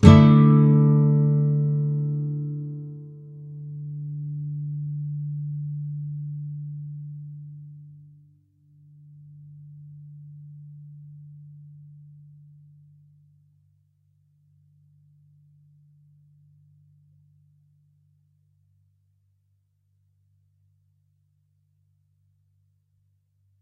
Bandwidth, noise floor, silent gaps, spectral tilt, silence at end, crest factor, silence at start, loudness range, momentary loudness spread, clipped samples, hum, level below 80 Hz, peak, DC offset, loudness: 6.4 kHz; -69 dBFS; none; -9 dB/octave; 12.15 s; 26 dB; 0 s; 25 LU; 29 LU; under 0.1%; none; -50 dBFS; 0 dBFS; under 0.1%; -22 LUFS